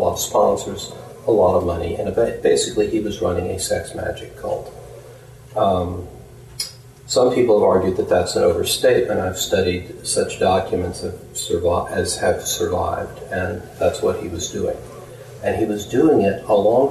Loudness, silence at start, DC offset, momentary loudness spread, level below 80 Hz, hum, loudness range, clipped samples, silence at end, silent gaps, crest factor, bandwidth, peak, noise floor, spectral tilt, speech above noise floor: -20 LUFS; 0 s; under 0.1%; 13 LU; -44 dBFS; none; 6 LU; under 0.1%; 0 s; none; 14 dB; 13 kHz; -6 dBFS; -41 dBFS; -4.5 dB/octave; 22 dB